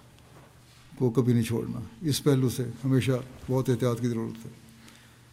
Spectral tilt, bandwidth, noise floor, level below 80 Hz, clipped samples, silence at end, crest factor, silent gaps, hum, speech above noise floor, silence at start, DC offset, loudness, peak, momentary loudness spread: -6.5 dB/octave; 16 kHz; -54 dBFS; -60 dBFS; under 0.1%; 0.4 s; 18 dB; none; none; 27 dB; 0.9 s; under 0.1%; -28 LUFS; -12 dBFS; 10 LU